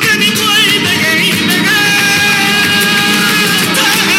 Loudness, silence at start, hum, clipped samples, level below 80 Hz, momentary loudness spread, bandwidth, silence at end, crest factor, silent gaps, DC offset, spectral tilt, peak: -8 LUFS; 0 s; none; under 0.1%; -54 dBFS; 1 LU; 17 kHz; 0 s; 10 dB; none; under 0.1%; -2 dB/octave; 0 dBFS